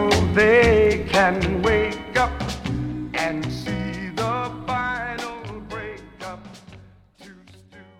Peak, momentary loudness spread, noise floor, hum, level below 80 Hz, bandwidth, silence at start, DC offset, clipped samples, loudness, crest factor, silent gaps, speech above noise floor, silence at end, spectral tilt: -4 dBFS; 20 LU; -48 dBFS; none; -36 dBFS; 15.5 kHz; 0 s; under 0.1%; under 0.1%; -21 LUFS; 18 dB; none; 30 dB; 0.15 s; -5.5 dB/octave